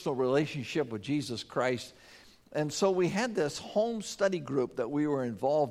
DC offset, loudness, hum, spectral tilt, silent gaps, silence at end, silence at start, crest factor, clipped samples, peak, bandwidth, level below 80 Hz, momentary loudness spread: under 0.1%; -31 LUFS; none; -5 dB/octave; none; 0 s; 0 s; 16 dB; under 0.1%; -14 dBFS; 15 kHz; -68 dBFS; 5 LU